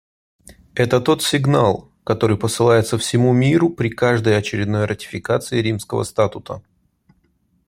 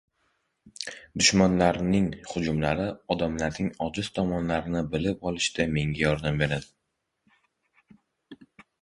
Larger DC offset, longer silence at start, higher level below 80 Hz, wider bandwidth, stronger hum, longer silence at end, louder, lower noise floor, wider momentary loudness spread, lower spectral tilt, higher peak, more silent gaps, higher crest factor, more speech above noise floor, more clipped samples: neither; about the same, 0.75 s vs 0.65 s; second, -52 dBFS vs -46 dBFS; first, 16 kHz vs 11 kHz; neither; first, 1.1 s vs 0.45 s; first, -18 LUFS vs -26 LUFS; second, -62 dBFS vs -80 dBFS; about the same, 9 LU vs 10 LU; about the same, -5.5 dB/octave vs -4.5 dB/octave; first, -2 dBFS vs -6 dBFS; neither; second, 16 dB vs 22 dB; second, 45 dB vs 54 dB; neither